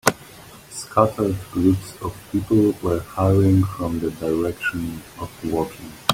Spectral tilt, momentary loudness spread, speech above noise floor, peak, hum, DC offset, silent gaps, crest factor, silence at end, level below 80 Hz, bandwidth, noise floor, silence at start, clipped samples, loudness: -6 dB/octave; 16 LU; 22 dB; 0 dBFS; none; under 0.1%; none; 20 dB; 0 s; -46 dBFS; 16.5 kHz; -43 dBFS; 0.05 s; under 0.1%; -22 LUFS